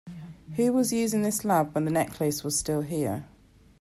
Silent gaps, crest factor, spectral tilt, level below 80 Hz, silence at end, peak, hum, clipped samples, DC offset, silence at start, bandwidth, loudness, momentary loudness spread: none; 14 dB; -5 dB/octave; -56 dBFS; 0.55 s; -12 dBFS; none; under 0.1%; under 0.1%; 0.05 s; 16 kHz; -27 LUFS; 11 LU